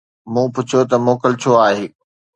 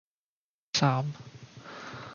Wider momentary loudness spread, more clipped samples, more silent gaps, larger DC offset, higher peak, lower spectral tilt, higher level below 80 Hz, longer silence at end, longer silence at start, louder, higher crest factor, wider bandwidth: second, 9 LU vs 21 LU; neither; neither; neither; first, 0 dBFS vs -10 dBFS; first, -6 dB/octave vs -4.5 dB/octave; first, -62 dBFS vs -70 dBFS; first, 0.5 s vs 0 s; second, 0.25 s vs 0.75 s; first, -16 LUFS vs -29 LUFS; second, 16 dB vs 24 dB; first, 9 kHz vs 7.2 kHz